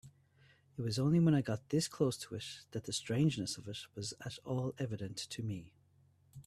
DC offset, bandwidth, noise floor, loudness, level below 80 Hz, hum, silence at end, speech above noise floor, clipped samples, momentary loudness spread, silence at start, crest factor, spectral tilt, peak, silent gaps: under 0.1%; 13.5 kHz; -69 dBFS; -37 LUFS; -68 dBFS; none; 0.05 s; 33 dB; under 0.1%; 14 LU; 0.05 s; 18 dB; -5.5 dB/octave; -20 dBFS; none